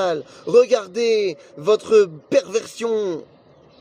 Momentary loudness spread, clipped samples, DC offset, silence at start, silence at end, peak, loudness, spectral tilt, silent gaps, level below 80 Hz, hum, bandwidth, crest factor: 11 LU; under 0.1%; under 0.1%; 0 s; 0.6 s; -4 dBFS; -19 LUFS; -4 dB/octave; none; -70 dBFS; none; 11 kHz; 16 dB